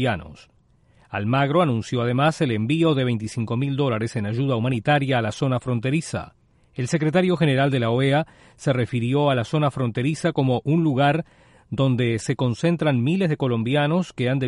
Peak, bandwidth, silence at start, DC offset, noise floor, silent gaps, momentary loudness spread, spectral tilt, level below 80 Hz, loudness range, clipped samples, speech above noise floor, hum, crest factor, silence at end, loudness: -6 dBFS; 11.5 kHz; 0 s; under 0.1%; -57 dBFS; none; 7 LU; -7 dB/octave; -54 dBFS; 1 LU; under 0.1%; 36 dB; none; 16 dB; 0 s; -22 LUFS